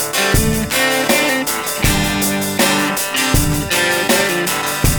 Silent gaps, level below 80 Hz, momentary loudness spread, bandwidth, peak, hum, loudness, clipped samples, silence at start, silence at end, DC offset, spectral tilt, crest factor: none; -26 dBFS; 3 LU; 19.5 kHz; 0 dBFS; none; -15 LUFS; under 0.1%; 0 s; 0 s; under 0.1%; -3 dB/octave; 14 dB